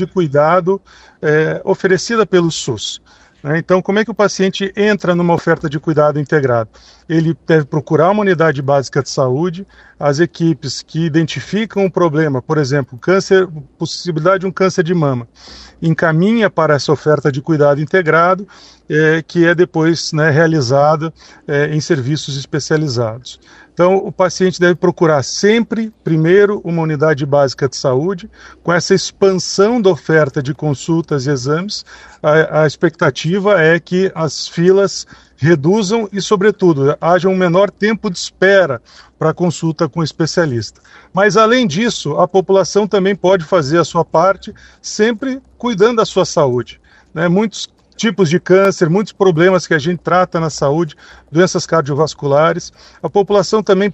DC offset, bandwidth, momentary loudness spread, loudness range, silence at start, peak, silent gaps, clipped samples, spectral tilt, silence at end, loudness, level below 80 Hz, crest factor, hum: under 0.1%; 8.4 kHz; 9 LU; 3 LU; 0 s; 0 dBFS; none; under 0.1%; -5.5 dB/octave; 0 s; -14 LUFS; -50 dBFS; 14 dB; none